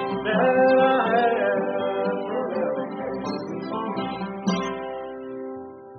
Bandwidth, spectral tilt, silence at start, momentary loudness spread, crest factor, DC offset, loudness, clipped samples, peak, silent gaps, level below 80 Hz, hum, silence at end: 6.4 kHz; -4 dB/octave; 0 s; 16 LU; 18 dB; under 0.1%; -24 LUFS; under 0.1%; -6 dBFS; none; -62 dBFS; none; 0 s